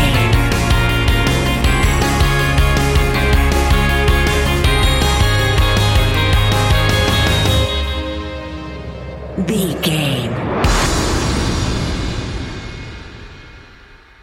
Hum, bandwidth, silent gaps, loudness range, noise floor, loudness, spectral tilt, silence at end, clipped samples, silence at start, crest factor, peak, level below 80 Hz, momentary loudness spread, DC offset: none; 17 kHz; none; 5 LU; -42 dBFS; -15 LUFS; -4.5 dB/octave; 0.65 s; under 0.1%; 0 s; 12 dB; -2 dBFS; -20 dBFS; 13 LU; under 0.1%